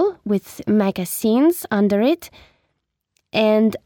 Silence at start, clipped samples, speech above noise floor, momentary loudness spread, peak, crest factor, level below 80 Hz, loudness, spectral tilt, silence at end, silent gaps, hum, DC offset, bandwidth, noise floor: 0 s; under 0.1%; 56 dB; 7 LU; -6 dBFS; 14 dB; -58 dBFS; -19 LUFS; -5.5 dB/octave; 0.1 s; none; none; under 0.1%; 19.5 kHz; -74 dBFS